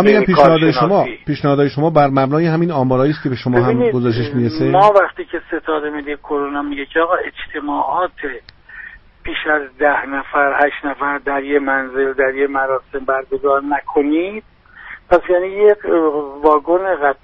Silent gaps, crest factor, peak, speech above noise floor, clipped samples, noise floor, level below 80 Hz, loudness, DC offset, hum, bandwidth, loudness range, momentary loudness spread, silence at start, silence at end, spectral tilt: none; 16 dB; 0 dBFS; 22 dB; under 0.1%; -37 dBFS; -44 dBFS; -16 LUFS; under 0.1%; none; 6.6 kHz; 6 LU; 12 LU; 0 s; 0.1 s; -8.5 dB/octave